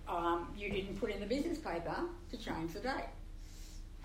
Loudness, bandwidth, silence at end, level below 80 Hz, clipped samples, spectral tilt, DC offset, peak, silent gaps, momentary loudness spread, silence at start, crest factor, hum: -40 LUFS; 16 kHz; 0 s; -50 dBFS; under 0.1%; -5.5 dB/octave; under 0.1%; -22 dBFS; none; 16 LU; 0 s; 18 dB; none